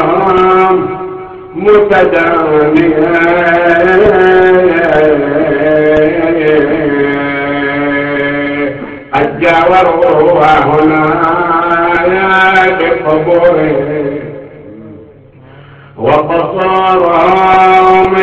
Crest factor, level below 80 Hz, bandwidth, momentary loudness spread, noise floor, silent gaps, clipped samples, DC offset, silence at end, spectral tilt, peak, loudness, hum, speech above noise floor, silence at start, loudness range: 8 dB; -38 dBFS; 7.4 kHz; 8 LU; -36 dBFS; none; under 0.1%; under 0.1%; 0 s; -7.5 dB/octave; 0 dBFS; -8 LUFS; none; 29 dB; 0 s; 6 LU